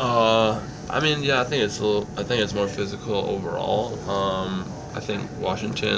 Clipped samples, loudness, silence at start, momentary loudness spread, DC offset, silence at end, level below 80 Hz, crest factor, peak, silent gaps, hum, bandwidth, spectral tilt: under 0.1%; -24 LUFS; 0 s; 9 LU; under 0.1%; 0 s; -46 dBFS; 20 dB; -4 dBFS; none; none; 8 kHz; -5 dB/octave